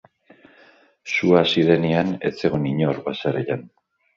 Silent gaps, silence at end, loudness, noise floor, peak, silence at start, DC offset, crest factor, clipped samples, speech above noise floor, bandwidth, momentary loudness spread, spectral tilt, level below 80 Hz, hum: none; 0.5 s; -21 LUFS; -54 dBFS; -2 dBFS; 1.05 s; under 0.1%; 20 dB; under 0.1%; 34 dB; 7.4 kHz; 10 LU; -6.5 dB/octave; -56 dBFS; none